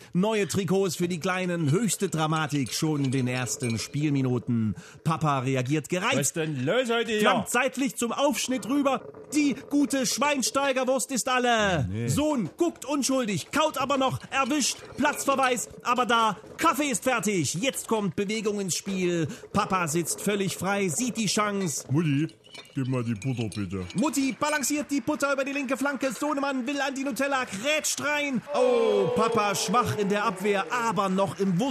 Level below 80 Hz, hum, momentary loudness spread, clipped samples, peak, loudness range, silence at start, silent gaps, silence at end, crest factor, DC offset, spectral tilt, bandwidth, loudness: -62 dBFS; none; 5 LU; under 0.1%; -10 dBFS; 3 LU; 0 s; none; 0 s; 16 dB; under 0.1%; -4.5 dB/octave; 14 kHz; -26 LUFS